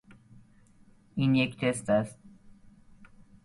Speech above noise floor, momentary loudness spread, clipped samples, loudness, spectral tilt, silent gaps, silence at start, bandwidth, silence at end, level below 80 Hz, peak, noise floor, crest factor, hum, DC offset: 32 dB; 12 LU; under 0.1%; -28 LUFS; -6 dB/octave; none; 1.15 s; 11.5 kHz; 0.4 s; -62 dBFS; -12 dBFS; -59 dBFS; 20 dB; none; under 0.1%